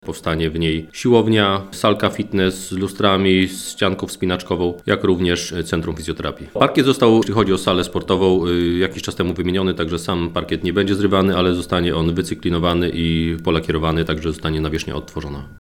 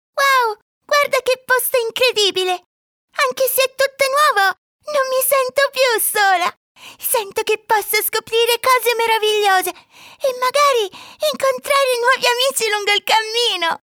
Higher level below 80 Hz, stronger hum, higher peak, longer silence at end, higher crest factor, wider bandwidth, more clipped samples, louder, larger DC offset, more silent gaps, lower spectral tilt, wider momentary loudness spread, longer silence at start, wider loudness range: first, -38 dBFS vs -68 dBFS; neither; about the same, 0 dBFS vs -2 dBFS; second, 0.05 s vs 0.2 s; about the same, 18 dB vs 16 dB; second, 17 kHz vs over 20 kHz; neither; second, -19 LUFS vs -16 LUFS; neither; second, none vs 0.62-0.81 s, 2.66-3.08 s, 4.58-4.79 s, 6.57-6.75 s; first, -5.5 dB/octave vs 0.5 dB/octave; about the same, 8 LU vs 8 LU; about the same, 0.05 s vs 0.15 s; about the same, 3 LU vs 1 LU